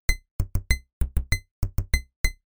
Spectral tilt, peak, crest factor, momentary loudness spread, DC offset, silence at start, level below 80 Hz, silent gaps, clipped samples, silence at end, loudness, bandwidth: -3.5 dB/octave; -6 dBFS; 20 dB; 5 LU; 0.9%; 0.1 s; -28 dBFS; 0.31-0.39 s, 0.93-1.01 s, 1.51-1.62 s, 2.16-2.24 s; under 0.1%; 0 s; -30 LUFS; over 20 kHz